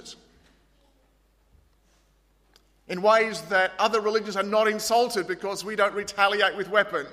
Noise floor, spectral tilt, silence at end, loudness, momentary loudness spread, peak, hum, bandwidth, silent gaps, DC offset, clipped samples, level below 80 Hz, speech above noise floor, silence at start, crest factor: -64 dBFS; -3 dB/octave; 0 s; -24 LUFS; 8 LU; -6 dBFS; none; 15.5 kHz; none; under 0.1%; under 0.1%; -64 dBFS; 40 dB; 0.05 s; 20 dB